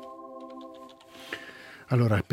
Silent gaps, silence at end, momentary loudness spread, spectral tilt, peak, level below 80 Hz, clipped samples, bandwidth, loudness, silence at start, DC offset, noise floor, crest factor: none; 0.1 s; 22 LU; -7.5 dB/octave; -10 dBFS; -64 dBFS; under 0.1%; 15 kHz; -29 LUFS; 0 s; under 0.1%; -48 dBFS; 22 dB